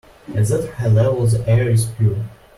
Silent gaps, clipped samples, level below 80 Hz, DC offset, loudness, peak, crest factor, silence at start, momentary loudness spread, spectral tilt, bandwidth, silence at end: none; under 0.1%; -42 dBFS; under 0.1%; -18 LUFS; -6 dBFS; 12 dB; 0.3 s; 5 LU; -7 dB/octave; 12.5 kHz; 0.25 s